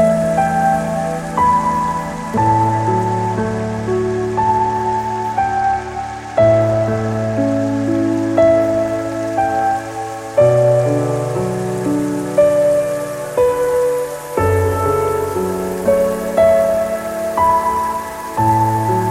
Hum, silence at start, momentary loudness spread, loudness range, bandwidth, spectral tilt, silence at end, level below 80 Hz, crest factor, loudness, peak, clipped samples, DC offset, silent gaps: none; 0 s; 8 LU; 2 LU; 16.5 kHz; -7 dB/octave; 0 s; -40 dBFS; 14 dB; -16 LUFS; -2 dBFS; under 0.1%; under 0.1%; none